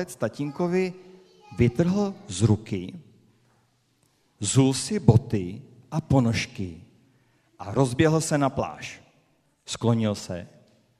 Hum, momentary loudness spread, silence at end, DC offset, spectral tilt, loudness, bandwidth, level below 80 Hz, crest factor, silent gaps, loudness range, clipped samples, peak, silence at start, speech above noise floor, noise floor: none; 16 LU; 0.55 s; under 0.1%; -6 dB/octave; -25 LUFS; 14 kHz; -50 dBFS; 24 dB; none; 3 LU; under 0.1%; -2 dBFS; 0 s; 43 dB; -67 dBFS